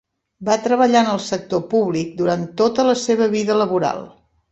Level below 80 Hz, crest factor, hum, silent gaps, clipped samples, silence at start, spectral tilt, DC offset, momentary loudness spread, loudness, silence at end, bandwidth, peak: -58 dBFS; 18 dB; none; none; under 0.1%; 0.4 s; -5 dB/octave; under 0.1%; 8 LU; -18 LUFS; 0.45 s; 8.2 kHz; 0 dBFS